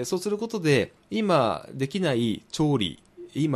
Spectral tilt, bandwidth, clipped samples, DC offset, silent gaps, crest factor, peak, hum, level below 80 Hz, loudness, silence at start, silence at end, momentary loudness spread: -5.5 dB/octave; 14 kHz; under 0.1%; under 0.1%; none; 18 dB; -8 dBFS; none; -56 dBFS; -26 LUFS; 0 s; 0 s; 8 LU